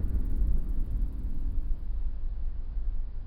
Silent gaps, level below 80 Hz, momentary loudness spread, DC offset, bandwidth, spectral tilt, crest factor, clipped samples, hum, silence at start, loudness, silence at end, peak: none; -28 dBFS; 7 LU; under 0.1%; 1.6 kHz; -10 dB/octave; 12 dB; under 0.1%; none; 0 s; -36 LUFS; 0 s; -16 dBFS